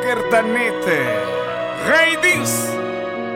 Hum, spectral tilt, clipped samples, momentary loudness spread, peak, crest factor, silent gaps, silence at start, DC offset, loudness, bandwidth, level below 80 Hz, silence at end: none; -3 dB/octave; under 0.1%; 10 LU; -4 dBFS; 14 dB; none; 0 s; under 0.1%; -17 LUFS; 17 kHz; -56 dBFS; 0 s